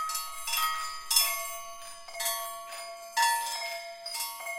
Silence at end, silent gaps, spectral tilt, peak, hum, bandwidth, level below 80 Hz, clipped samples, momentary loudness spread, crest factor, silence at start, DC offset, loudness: 0 s; none; 3.5 dB/octave; -8 dBFS; none; 17 kHz; -66 dBFS; under 0.1%; 16 LU; 26 dB; 0 s; under 0.1%; -30 LUFS